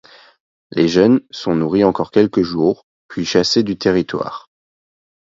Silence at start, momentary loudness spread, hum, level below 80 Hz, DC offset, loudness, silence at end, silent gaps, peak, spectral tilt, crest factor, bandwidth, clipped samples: 0.7 s; 13 LU; none; -50 dBFS; under 0.1%; -16 LUFS; 0.85 s; 2.83-3.09 s; 0 dBFS; -5.5 dB/octave; 16 dB; 7.8 kHz; under 0.1%